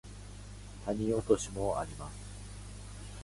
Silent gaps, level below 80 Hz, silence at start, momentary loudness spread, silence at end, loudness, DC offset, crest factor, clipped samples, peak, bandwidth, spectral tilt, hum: none; -48 dBFS; 0.05 s; 18 LU; 0 s; -34 LUFS; under 0.1%; 24 dB; under 0.1%; -12 dBFS; 11.5 kHz; -5.5 dB/octave; 50 Hz at -45 dBFS